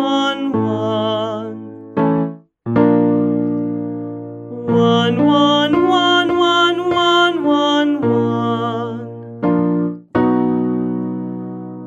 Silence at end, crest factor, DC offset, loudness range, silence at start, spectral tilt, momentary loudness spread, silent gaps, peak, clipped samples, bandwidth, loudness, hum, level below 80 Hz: 0 s; 14 dB; under 0.1%; 5 LU; 0 s; -6.5 dB/octave; 14 LU; none; -2 dBFS; under 0.1%; 7.8 kHz; -16 LUFS; none; -56 dBFS